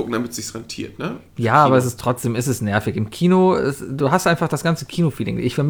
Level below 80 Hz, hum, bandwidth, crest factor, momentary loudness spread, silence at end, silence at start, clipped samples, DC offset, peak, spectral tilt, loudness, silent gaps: -50 dBFS; none; over 20 kHz; 18 dB; 14 LU; 0 s; 0 s; under 0.1%; under 0.1%; -2 dBFS; -6 dB/octave; -19 LUFS; none